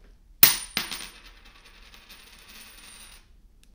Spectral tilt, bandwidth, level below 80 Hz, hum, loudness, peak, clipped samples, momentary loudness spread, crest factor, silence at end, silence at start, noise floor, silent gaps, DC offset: 0 dB/octave; 16 kHz; -54 dBFS; none; -20 LUFS; 0 dBFS; under 0.1%; 28 LU; 30 dB; 2.65 s; 0.4 s; -54 dBFS; none; under 0.1%